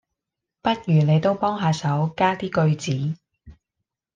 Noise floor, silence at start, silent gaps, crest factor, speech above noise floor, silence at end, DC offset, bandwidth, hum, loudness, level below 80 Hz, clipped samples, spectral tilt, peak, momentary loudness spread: -84 dBFS; 0.65 s; none; 16 dB; 63 dB; 0.65 s; under 0.1%; 7.6 kHz; none; -22 LUFS; -56 dBFS; under 0.1%; -7 dB/octave; -6 dBFS; 8 LU